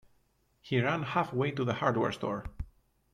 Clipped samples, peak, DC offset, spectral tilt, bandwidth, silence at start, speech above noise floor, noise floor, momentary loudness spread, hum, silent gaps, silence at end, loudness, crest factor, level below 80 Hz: under 0.1%; -14 dBFS; under 0.1%; -7 dB/octave; 11.5 kHz; 0.65 s; 40 dB; -71 dBFS; 14 LU; none; none; 0.5 s; -31 LUFS; 20 dB; -52 dBFS